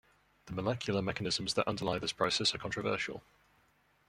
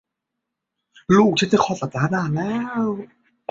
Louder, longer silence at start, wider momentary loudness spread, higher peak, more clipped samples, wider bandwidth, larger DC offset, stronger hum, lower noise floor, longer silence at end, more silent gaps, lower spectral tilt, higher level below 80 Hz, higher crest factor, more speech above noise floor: second, -34 LUFS vs -20 LUFS; second, 0.45 s vs 1.1 s; second, 8 LU vs 15 LU; second, -14 dBFS vs -4 dBFS; neither; first, 15 kHz vs 7.8 kHz; neither; neither; second, -70 dBFS vs -81 dBFS; first, 0.9 s vs 0.45 s; neither; second, -4 dB/octave vs -6 dB/octave; second, -62 dBFS vs -56 dBFS; about the same, 22 dB vs 18 dB; second, 36 dB vs 62 dB